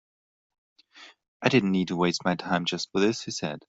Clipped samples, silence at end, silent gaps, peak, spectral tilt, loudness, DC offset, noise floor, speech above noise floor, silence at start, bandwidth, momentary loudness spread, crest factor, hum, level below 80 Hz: under 0.1%; 0.1 s; 1.28-1.40 s; -4 dBFS; -5 dB/octave; -26 LUFS; under 0.1%; -53 dBFS; 27 dB; 0.95 s; 8 kHz; 5 LU; 24 dB; none; -66 dBFS